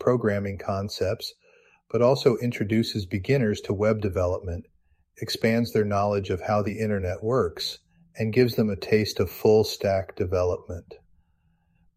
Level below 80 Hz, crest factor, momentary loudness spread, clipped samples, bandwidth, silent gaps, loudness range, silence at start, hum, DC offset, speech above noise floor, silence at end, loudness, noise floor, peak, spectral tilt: -52 dBFS; 20 dB; 10 LU; under 0.1%; 15.5 kHz; none; 2 LU; 0 s; none; under 0.1%; 42 dB; 1 s; -25 LUFS; -67 dBFS; -6 dBFS; -6.5 dB/octave